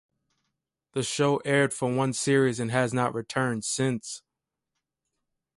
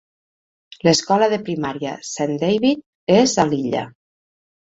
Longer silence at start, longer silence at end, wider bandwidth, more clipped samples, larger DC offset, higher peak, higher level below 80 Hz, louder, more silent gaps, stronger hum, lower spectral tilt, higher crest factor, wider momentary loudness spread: about the same, 0.95 s vs 0.85 s; first, 1.4 s vs 0.85 s; first, 11.5 kHz vs 8 kHz; neither; neither; second, -10 dBFS vs -2 dBFS; second, -66 dBFS vs -58 dBFS; second, -26 LUFS vs -19 LUFS; second, none vs 2.86-3.07 s; neither; about the same, -4.5 dB/octave vs -4.5 dB/octave; about the same, 18 dB vs 18 dB; about the same, 10 LU vs 10 LU